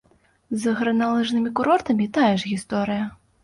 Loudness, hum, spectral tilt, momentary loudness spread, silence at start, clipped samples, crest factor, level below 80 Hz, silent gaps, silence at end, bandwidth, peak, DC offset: -22 LUFS; none; -5.5 dB/octave; 7 LU; 0.5 s; under 0.1%; 16 dB; -58 dBFS; none; 0.3 s; 11.5 kHz; -6 dBFS; under 0.1%